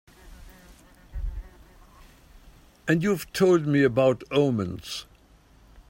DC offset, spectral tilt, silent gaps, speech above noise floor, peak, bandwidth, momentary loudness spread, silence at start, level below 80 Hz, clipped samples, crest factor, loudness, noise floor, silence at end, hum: under 0.1%; -6.5 dB/octave; none; 33 dB; -8 dBFS; 16.5 kHz; 18 LU; 0.25 s; -44 dBFS; under 0.1%; 18 dB; -24 LUFS; -56 dBFS; 0.1 s; none